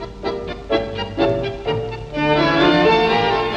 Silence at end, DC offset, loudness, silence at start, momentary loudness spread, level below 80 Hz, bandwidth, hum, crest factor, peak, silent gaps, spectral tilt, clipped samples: 0 s; under 0.1%; -18 LUFS; 0 s; 12 LU; -38 dBFS; 8.6 kHz; none; 16 dB; -2 dBFS; none; -6.5 dB/octave; under 0.1%